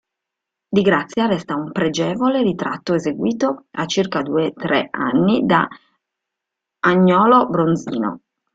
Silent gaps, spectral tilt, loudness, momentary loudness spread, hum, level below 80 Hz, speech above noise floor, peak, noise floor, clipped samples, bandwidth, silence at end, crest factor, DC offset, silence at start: none; -6 dB/octave; -18 LUFS; 10 LU; none; -58 dBFS; 65 dB; -2 dBFS; -83 dBFS; under 0.1%; 7.8 kHz; 0.4 s; 18 dB; under 0.1%; 0.7 s